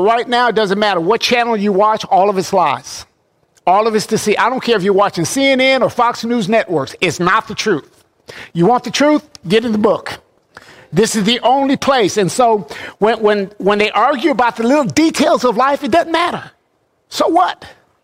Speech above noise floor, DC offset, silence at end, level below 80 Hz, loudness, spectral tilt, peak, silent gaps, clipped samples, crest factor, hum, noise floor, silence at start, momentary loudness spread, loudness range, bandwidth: 48 dB; under 0.1%; 0.3 s; -52 dBFS; -14 LUFS; -4.5 dB/octave; -2 dBFS; none; under 0.1%; 14 dB; none; -61 dBFS; 0 s; 7 LU; 2 LU; 16 kHz